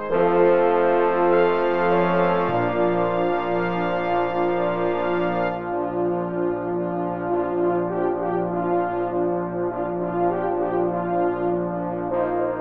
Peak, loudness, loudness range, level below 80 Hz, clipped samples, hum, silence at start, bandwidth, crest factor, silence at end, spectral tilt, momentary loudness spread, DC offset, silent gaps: -6 dBFS; -22 LUFS; 4 LU; -54 dBFS; under 0.1%; none; 0 s; 5.2 kHz; 16 dB; 0 s; -9.5 dB/octave; 7 LU; under 0.1%; none